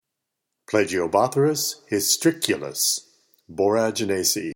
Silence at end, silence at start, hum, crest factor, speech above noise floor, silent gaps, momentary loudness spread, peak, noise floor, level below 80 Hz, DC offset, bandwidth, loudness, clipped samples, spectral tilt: 0 s; 0.7 s; none; 22 dB; 60 dB; none; 5 LU; 0 dBFS; -82 dBFS; -64 dBFS; under 0.1%; 17.5 kHz; -22 LUFS; under 0.1%; -3 dB/octave